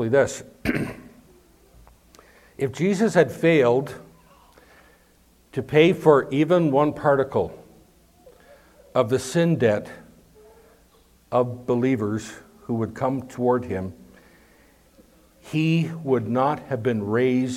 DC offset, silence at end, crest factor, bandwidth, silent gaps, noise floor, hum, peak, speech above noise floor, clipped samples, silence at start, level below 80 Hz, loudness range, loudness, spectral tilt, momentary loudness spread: under 0.1%; 0 s; 22 dB; 15.5 kHz; none; -58 dBFS; none; -2 dBFS; 36 dB; under 0.1%; 0 s; -56 dBFS; 6 LU; -22 LUFS; -6.5 dB/octave; 13 LU